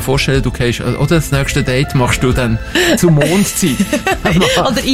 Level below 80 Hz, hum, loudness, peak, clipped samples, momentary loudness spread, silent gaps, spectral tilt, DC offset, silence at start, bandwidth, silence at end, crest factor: -26 dBFS; none; -13 LUFS; 0 dBFS; under 0.1%; 5 LU; none; -5 dB/octave; 1%; 0 s; 16.5 kHz; 0 s; 12 dB